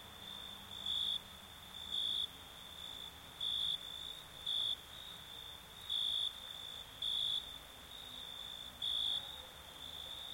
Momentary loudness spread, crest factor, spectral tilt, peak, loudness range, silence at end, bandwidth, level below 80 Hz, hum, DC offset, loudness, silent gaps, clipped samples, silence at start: 14 LU; 16 dB; -1 dB/octave; -28 dBFS; 2 LU; 0 s; 16.5 kHz; -66 dBFS; none; under 0.1%; -40 LUFS; none; under 0.1%; 0 s